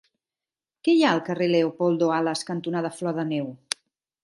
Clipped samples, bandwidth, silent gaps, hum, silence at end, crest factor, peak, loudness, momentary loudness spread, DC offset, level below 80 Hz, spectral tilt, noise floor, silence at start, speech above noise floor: under 0.1%; 11.5 kHz; none; none; 0.7 s; 24 dB; -2 dBFS; -24 LUFS; 11 LU; under 0.1%; -76 dBFS; -5.5 dB/octave; under -90 dBFS; 0.85 s; over 67 dB